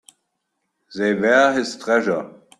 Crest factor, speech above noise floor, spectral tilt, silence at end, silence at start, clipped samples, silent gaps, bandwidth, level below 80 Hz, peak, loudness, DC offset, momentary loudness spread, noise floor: 18 dB; 57 dB; -4.5 dB/octave; 0.3 s; 0.9 s; under 0.1%; none; 12 kHz; -66 dBFS; -4 dBFS; -19 LUFS; under 0.1%; 10 LU; -75 dBFS